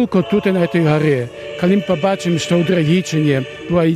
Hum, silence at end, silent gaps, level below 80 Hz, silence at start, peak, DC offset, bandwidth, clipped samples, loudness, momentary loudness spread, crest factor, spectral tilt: none; 0 s; none; -50 dBFS; 0 s; -2 dBFS; under 0.1%; 13.5 kHz; under 0.1%; -16 LUFS; 5 LU; 14 dB; -6.5 dB/octave